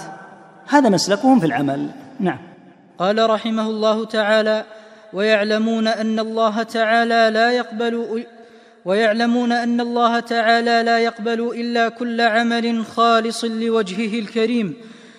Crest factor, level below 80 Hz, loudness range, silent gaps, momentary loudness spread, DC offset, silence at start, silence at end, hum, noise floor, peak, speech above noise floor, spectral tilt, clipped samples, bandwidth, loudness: 18 dB; -70 dBFS; 2 LU; none; 9 LU; under 0.1%; 0 s; 0.15 s; none; -45 dBFS; 0 dBFS; 27 dB; -4.5 dB/octave; under 0.1%; 12 kHz; -18 LUFS